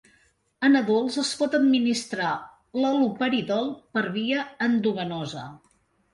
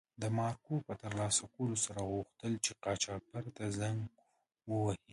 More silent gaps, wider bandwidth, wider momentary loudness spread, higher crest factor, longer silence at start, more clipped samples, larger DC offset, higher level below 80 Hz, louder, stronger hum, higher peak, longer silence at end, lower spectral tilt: neither; about the same, 11.5 kHz vs 11.5 kHz; first, 12 LU vs 8 LU; about the same, 16 dB vs 20 dB; first, 0.6 s vs 0.2 s; neither; neither; about the same, -68 dBFS vs -64 dBFS; first, -25 LUFS vs -38 LUFS; neither; first, -10 dBFS vs -18 dBFS; first, 0.55 s vs 0 s; about the same, -4.5 dB/octave vs -4 dB/octave